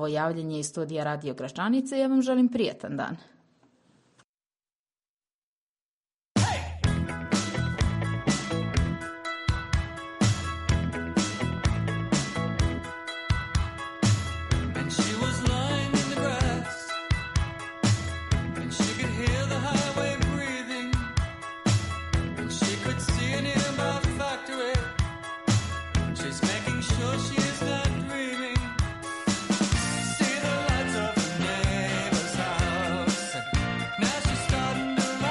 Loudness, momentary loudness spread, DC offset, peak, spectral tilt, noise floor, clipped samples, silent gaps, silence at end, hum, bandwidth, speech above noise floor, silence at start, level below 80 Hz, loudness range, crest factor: -28 LUFS; 5 LU; under 0.1%; -12 dBFS; -5 dB/octave; under -90 dBFS; under 0.1%; 4.24-4.38 s, 4.75-4.86 s, 5.08-5.17 s, 5.34-6.03 s, 6.25-6.35 s; 0 s; none; 11.5 kHz; over 63 dB; 0 s; -38 dBFS; 3 LU; 16 dB